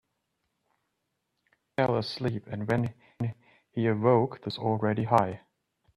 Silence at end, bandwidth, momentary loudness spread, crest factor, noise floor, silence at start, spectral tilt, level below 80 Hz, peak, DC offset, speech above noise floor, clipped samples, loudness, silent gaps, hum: 0.6 s; 11 kHz; 11 LU; 24 dB; -80 dBFS; 1.8 s; -8 dB/octave; -64 dBFS; -6 dBFS; under 0.1%; 53 dB; under 0.1%; -29 LUFS; none; none